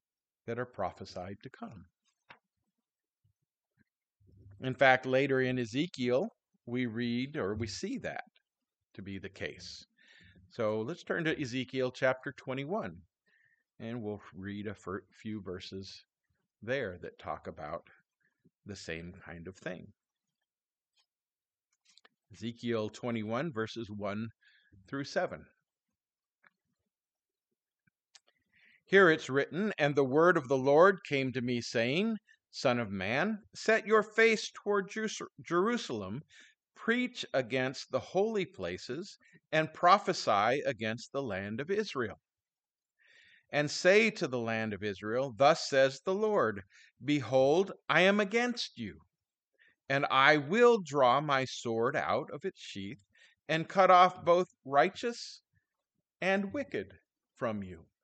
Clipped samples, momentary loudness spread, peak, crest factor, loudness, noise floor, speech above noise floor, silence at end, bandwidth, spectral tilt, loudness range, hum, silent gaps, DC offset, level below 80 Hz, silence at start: under 0.1%; 18 LU; -8 dBFS; 24 dB; -31 LUFS; under -90 dBFS; over 59 dB; 0.2 s; 9 kHz; -5 dB/octave; 15 LU; none; 49.48-49.52 s; under 0.1%; -72 dBFS; 0.45 s